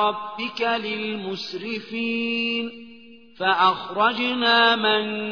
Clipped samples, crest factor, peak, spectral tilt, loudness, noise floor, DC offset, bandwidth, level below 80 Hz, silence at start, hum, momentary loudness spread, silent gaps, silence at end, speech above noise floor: under 0.1%; 18 dB; -4 dBFS; -4.5 dB/octave; -22 LUFS; -47 dBFS; 0.2%; 5.4 kHz; -70 dBFS; 0 s; none; 13 LU; none; 0 s; 24 dB